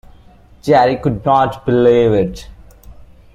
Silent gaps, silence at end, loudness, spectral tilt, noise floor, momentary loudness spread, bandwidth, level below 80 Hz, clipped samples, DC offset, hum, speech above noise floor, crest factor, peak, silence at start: none; 0.3 s; -14 LUFS; -7.5 dB/octave; -44 dBFS; 11 LU; 12 kHz; -40 dBFS; under 0.1%; under 0.1%; none; 31 dB; 14 dB; -2 dBFS; 0.65 s